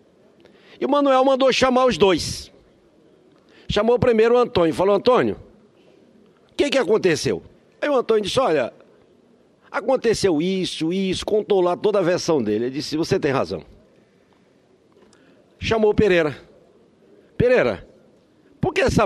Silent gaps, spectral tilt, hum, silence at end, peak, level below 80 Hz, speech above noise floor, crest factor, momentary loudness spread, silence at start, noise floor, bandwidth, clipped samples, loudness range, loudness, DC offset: none; -5 dB/octave; none; 0 s; -2 dBFS; -46 dBFS; 38 dB; 18 dB; 11 LU; 0.8 s; -57 dBFS; 13 kHz; under 0.1%; 4 LU; -20 LUFS; under 0.1%